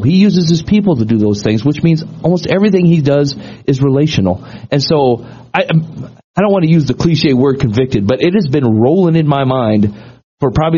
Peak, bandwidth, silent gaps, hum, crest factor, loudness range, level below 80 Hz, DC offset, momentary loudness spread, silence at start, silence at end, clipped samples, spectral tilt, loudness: 0 dBFS; 7.2 kHz; 6.24-6.34 s, 10.24-10.37 s; none; 12 dB; 2 LU; -40 dBFS; under 0.1%; 8 LU; 0 s; 0 s; under 0.1%; -6.5 dB/octave; -12 LUFS